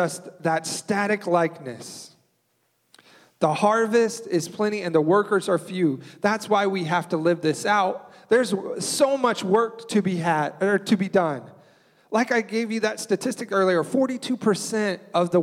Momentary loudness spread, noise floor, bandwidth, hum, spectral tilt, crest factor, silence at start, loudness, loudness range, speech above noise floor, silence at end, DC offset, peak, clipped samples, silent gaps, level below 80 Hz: 6 LU; -70 dBFS; 16 kHz; none; -5 dB/octave; 18 dB; 0 s; -23 LUFS; 3 LU; 47 dB; 0 s; under 0.1%; -6 dBFS; under 0.1%; none; -72 dBFS